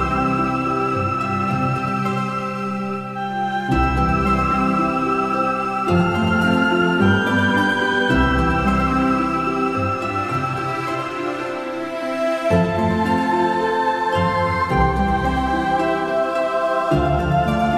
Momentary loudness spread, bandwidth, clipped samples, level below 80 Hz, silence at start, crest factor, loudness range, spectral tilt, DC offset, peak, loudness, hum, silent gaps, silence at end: 7 LU; 14.5 kHz; under 0.1%; -32 dBFS; 0 s; 14 dB; 4 LU; -6.5 dB/octave; under 0.1%; -4 dBFS; -19 LUFS; none; none; 0 s